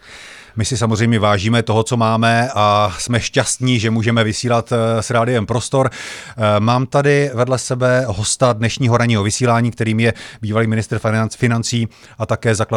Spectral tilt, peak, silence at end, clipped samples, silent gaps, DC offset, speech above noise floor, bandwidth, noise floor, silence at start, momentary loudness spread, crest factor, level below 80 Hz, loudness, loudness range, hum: -5 dB/octave; -2 dBFS; 0 s; under 0.1%; none; under 0.1%; 22 dB; 12.5 kHz; -38 dBFS; 0.05 s; 6 LU; 14 dB; -46 dBFS; -16 LUFS; 2 LU; none